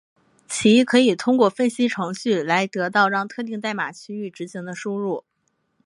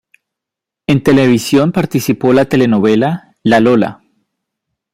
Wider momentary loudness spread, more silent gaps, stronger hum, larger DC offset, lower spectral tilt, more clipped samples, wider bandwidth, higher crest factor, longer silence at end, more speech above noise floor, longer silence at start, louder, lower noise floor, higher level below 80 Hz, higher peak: first, 15 LU vs 7 LU; neither; neither; neither; second, -4.5 dB/octave vs -6.5 dB/octave; neither; second, 11.5 kHz vs 16 kHz; first, 18 dB vs 12 dB; second, 0.65 s vs 1 s; second, 50 dB vs 72 dB; second, 0.5 s vs 0.9 s; second, -21 LUFS vs -12 LUFS; second, -71 dBFS vs -83 dBFS; second, -68 dBFS vs -48 dBFS; about the same, -2 dBFS vs 0 dBFS